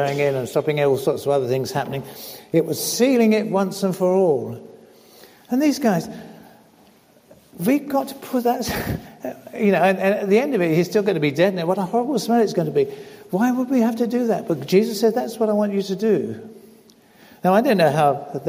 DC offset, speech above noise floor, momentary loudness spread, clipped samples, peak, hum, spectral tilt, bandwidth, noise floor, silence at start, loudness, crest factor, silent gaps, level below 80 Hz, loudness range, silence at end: under 0.1%; 33 dB; 11 LU; under 0.1%; -4 dBFS; none; -6 dB/octave; 16 kHz; -53 dBFS; 0 s; -20 LUFS; 16 dB; none; -54 dBFS; 5 LU; 0 s